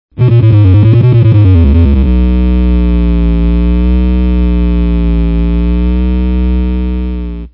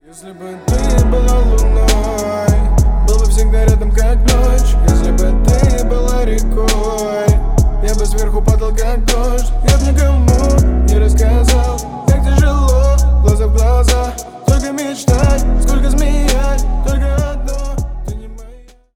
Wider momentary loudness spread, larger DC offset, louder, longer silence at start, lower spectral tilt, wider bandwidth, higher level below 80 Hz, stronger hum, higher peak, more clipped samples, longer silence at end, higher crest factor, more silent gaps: about the same, 6 LU vs 6 LU; second, under 0.1% vs 2%; first, -10 LUFS vs -14 LUFS; first, 0.15 s vs 0 s; first, -12 dB/octave vs -6 dB/octave; second, 4.4 kHz vs 16 kHz; about the same, -12 dBFS vs -12 dBFS; first, 60 Hz at -20 dBFS vs none; about the same, 0 dBFS vs 0 dBFS; first, 1% vs under 0.1%; about the same, 0.05 s vs 0 s; about the same, 8 dB vs 12 dB; neither